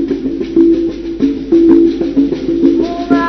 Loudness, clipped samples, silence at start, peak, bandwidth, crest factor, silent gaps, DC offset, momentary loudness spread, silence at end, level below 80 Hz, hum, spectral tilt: -12 LUFS; 0.4%; 0 s; 0 dBFS; 6.2 kHz; 12 dB; none; under 0.1%; 8 LU; 0 s; -36 dBFS; none; -7.5 dB/octave